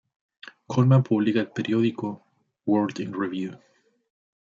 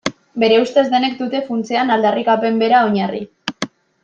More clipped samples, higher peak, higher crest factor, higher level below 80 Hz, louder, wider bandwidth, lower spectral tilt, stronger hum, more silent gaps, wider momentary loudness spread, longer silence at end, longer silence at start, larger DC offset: neither; second, -8 dBFS vs -2 dBFS; about the same, 18 dB vs 16 dB; second, -70 dBFS vs -62 dBFS; second, -24 LUFS vs -16 LUFS; second, 7.2 kHz vs 9.2 kHz; first, -8 dB/octave vs -5 dB/octave; neither; neither; first, 15 LU vs 12 LU; first, 1 s vs 0.35 s; first, 0.7 s vs 0.05 s; neither